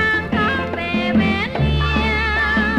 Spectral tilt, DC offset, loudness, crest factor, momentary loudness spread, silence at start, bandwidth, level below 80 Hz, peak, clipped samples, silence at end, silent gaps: -6.5 dB/octave; under 0.1%; -18 LUFS; 12 dB; 3 LU; 0 s; 9.8 kHz; -28 dBFS; -6 dBFS; under 0.1%; 0 s; none